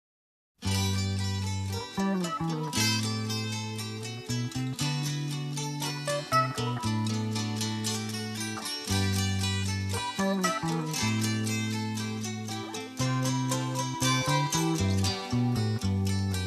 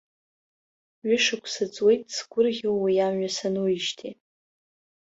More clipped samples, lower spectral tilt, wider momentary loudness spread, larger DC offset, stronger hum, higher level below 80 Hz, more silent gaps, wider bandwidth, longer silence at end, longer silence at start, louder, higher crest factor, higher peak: neither; about the same, -4.5 dB/octave vs -3.5 dB/octave; about the same, 7 LU vs 8 LU; neither; neither; first, -56 dBFS vs -70 dBFS; neither; first, 14 kHz vs 7.8 kHz; second, 0 s vs 0.9 s; second, 0.6 s vs 1.05 s; second, -30 LUFS vs -25 LUFS; about the same, 16 dB vs 18 dB; second, -14 dBFS vs -10 dBFS